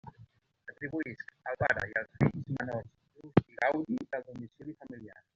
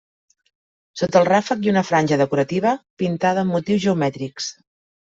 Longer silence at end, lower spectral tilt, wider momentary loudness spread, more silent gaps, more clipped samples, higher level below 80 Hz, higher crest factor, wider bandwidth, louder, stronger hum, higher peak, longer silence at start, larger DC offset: second, 0.2 s vs 0.55 s; about the same, -6.5 dB/octave vs -6 dB/octave; first, 18 LU vs 10 LU; second, none vs 2.90-2.97 s; neither; about the same, -62 dBFS vs -60 dBFS; first, 28 dB vs 18 dB; about the same, 7.6 kHz vs 7.8 kHz; second, -33 LUFS vs -20 LUFS; neither; about the same, -6 dBFS vs -4 dBFS; second, 0.05 s vs 0.95 s; neither